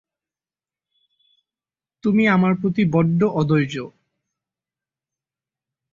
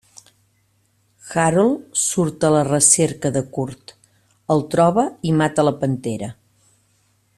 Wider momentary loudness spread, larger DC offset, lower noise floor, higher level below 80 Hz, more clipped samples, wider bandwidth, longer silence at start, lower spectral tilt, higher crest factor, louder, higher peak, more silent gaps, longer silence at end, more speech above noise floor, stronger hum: second, 10 LU vs 14 LU; neither; first, under -90 dBFS vs -63 dBFS; about the same, -58 dBFS vs -54 dBFS; neither; second, 7.2 kHz vs 13.5 kHz; first, 2.05 s vs 1.25 s; first, -8 dB/octave vs -4.5 dB/octave; about the same, 18 dB vs 20 dB; about the same, -19 LUFS vs -18 LUFS; second, -4 dBFS vs 0 dBFS; neither; first, 2.05 s vs 1.05 s; first, over 72 dB vs 45 dB; neither